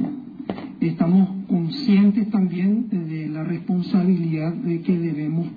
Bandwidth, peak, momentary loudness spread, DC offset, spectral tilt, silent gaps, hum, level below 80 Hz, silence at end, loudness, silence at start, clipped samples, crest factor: 5 kHz; -8 dBFS; 10 LU; under 0.1%; -10.5 dB/octave; none; none; -62 dBFS; 0 s; -21 LUFS; 0 s; under 0.1%; 14 dB